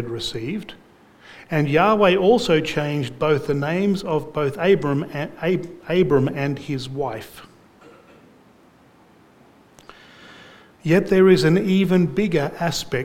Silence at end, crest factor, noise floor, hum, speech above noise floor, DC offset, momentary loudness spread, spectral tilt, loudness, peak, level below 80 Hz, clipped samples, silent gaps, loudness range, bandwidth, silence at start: 0 s; 18 dB; -52 dBFS; none; 33 dB; under 0.1%; 13 LU; -6.5 dB/octave; -20 LUFS; -4 dBFS; -50 dBFS; under 0.1%; none; 10 LU; 16 kHz; 0 s